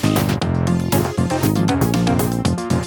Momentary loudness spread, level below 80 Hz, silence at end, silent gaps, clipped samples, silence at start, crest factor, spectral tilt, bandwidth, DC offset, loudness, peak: 2 LU; -36 dBFS; 0 s; none; under 0.1%; 0 s; 14 dB; -6 dB/octave; 19 kHz; under 0.1%; -18 LUFS; -4 dBFS